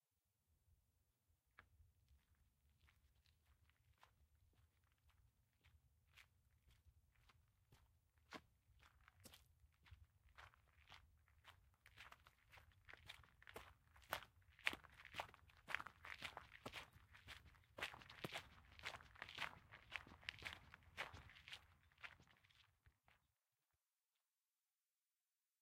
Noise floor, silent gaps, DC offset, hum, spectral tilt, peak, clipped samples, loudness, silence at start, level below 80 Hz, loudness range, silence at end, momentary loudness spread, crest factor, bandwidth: under -90 dBFS; none; under 0.1%; none; -2.5 dB/octave; -18 dBFS; under 0.1%; -55 LUFS; 0.5 s; -78 dBFS; 16 LU; 2.45 s; 17 LU; 42 dB; 16 kHz